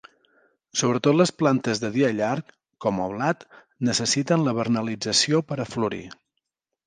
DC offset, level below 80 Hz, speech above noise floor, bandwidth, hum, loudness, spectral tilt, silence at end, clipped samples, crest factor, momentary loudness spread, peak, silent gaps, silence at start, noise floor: under 0.1%; -62 dBFS; 57 dB; 10.5 kHz; none; -23 LUFS; -4.5 dB/octave; 0.75 s; under 0.1%; 20 dB; 9 LU; -6 dBFS; none; 0.75 s; -81 dBFS